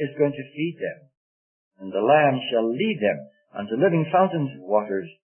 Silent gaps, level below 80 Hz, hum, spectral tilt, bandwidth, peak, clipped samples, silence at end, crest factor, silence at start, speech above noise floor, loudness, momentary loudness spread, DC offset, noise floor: 1.17-1.71 s; -74 dBFS; none; -11 dB/octave; 3.3 kHz; -6 dBFS; under 0.1%; 0.15 s; 18 dB; 0 s; over 67 dB; -23 LUFS; 14 LU; under 0.1%; under -90 dBFS